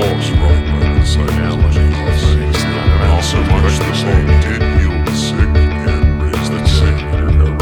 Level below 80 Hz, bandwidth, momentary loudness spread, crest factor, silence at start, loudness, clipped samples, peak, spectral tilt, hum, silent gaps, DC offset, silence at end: -14 dBFS; 12 kHz; 3 LU; 12 dB; 0 s; -14 LUFS; under 0.1%; 0 dBFS; -6 dB/octave; none; none; under 0.1%; 0 s